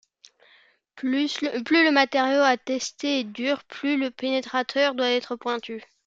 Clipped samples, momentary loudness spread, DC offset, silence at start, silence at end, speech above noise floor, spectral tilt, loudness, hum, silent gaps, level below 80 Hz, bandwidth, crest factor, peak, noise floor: under 0.1%; 10 LU; under 0.1%; 0.95 s; 0.25 s; 35 dB; -2.5 dB/octave; -24 LUFS; none; none; -74 dBFS; 7.8 kHz; 20 dB; -4 dBFS; -59 dBFS